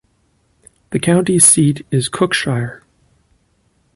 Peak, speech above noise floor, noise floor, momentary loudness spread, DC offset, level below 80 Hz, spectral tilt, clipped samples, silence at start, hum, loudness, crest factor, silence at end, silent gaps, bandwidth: 0 dBFS; 46 dB; -60 dBFS; 14 LU; under 0.1%; -52 dBFS; -4 dB/octave; under 0.1%; 0.9 s; none; -13 LUFS; 18 dB; 1.2 s; none; 16 kHz